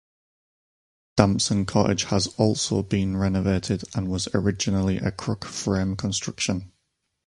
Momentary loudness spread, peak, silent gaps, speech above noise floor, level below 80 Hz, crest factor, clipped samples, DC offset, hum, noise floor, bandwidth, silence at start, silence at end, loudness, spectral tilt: 6 LU; 0 dBFS; none; 52 dB; -44 dBFS; 24 dB; under 0.1%; under 0.1%; none; -76 dBFS; 11.5 kHz; 1.15 s; 0.6 s; -24 LUFS; -5 dB/octave